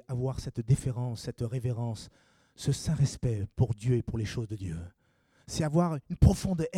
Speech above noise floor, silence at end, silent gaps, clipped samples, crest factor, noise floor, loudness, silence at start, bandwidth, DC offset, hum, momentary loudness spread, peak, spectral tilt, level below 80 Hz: 38 dB; 0 s; none; under 0.1%; 24 dB; -68 dBFS; -31 LUFS; 0.1 s; 14 kHz; under 0.1%; none; 13 LU; -6 dBFS; -7 dB/octave; -42 dBFS